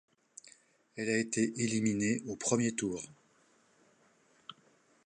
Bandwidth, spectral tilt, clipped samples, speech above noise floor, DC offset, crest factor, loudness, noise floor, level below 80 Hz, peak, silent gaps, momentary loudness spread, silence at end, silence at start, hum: 11 kHz; -4.5 dB/octave; under 0.1%; 36 dB; under 0.1%; 22 dB; -33 LUFS; -68 dBFS; -72 dBFS; -14 dBFS; none; 22 LU; 0.55 s; 0.45 s; none